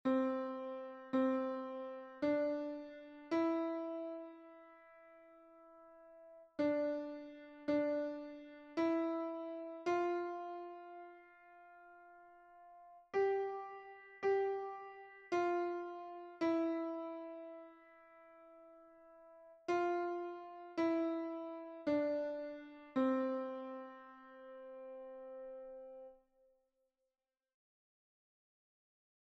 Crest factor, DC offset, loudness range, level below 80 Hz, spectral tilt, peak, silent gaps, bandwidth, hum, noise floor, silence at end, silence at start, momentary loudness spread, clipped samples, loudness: 16 dB; under 0.1%; 9 LU; -82 dBFS; -6 dB/octave; -24 dBFS; none; 7.6 kHz; none; under -90 dBFS; 3.1 s; 0.05 s; 24 LU; under 0.1%; -40 LUFS